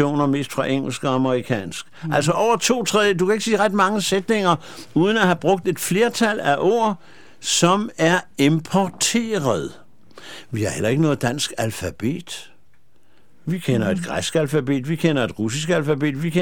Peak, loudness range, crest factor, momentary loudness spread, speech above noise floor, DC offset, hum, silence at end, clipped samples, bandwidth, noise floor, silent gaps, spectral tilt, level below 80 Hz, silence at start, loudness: -2 dBFS; 6 LU; 18 dB; 8 LU; 42 dB; 0.7%; none; 0 s; under 0.1%; 18 kHz; -62 dBFS; none; -4.5 dB/octave; -54 dBFS; 0 s; -20 LUFS